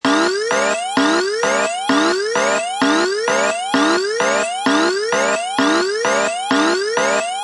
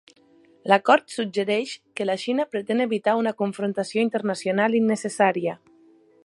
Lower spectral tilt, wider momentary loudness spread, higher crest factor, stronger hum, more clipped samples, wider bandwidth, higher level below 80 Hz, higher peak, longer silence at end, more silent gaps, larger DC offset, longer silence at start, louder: second, -2 dB/octave vs -5 dB/octave; second, 2 LU vs 8 LU; second, 16 dB vs 22 dB; neither; neither; about the same, 11.5 kHz vs 11.5 kHz; first, -68 dBFS vs -78 dBFS; about the same, -2 dBFS vs -2 dBFS; second, 0 s vs 0.7 s; neither; neither; second, 0.05 s vs 0.65 s; first, -17 LUFS vs -23 LUFS